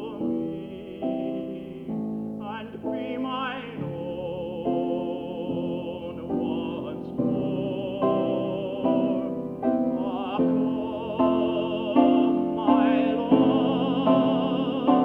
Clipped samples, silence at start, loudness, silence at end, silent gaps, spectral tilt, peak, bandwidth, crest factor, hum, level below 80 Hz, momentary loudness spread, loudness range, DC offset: under 0.1%; 0 s; -26 LUFS; 0 s; none; -9 dB/octave; -6 dBFS; 4 kHz; 18 dB; none; -58 dBFS; 12 LU; 10 LU; under 0.1%